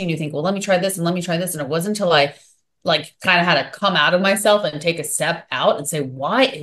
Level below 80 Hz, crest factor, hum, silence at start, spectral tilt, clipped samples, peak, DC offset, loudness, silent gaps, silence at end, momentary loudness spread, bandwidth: -64 dBFS; 18 dB; none; 0 s; -3.5 dB/octave; under 0.1%; -2 dBFS; under 0.1%; -19 LUFS; none; 0 s; 7 LU; 13 kHz